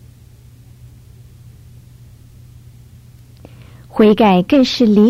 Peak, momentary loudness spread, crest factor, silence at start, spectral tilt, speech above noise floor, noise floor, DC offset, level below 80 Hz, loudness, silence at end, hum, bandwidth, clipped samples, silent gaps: -2 dBFS; 3 LU; 16 dB; 3.95 s; -7 dB/octave; 32 dB; -42 dBFS; under 0.1%; -46 dBFS; -12 LUFS; 0 s; none; 13.5 kHz; under 0.1%; none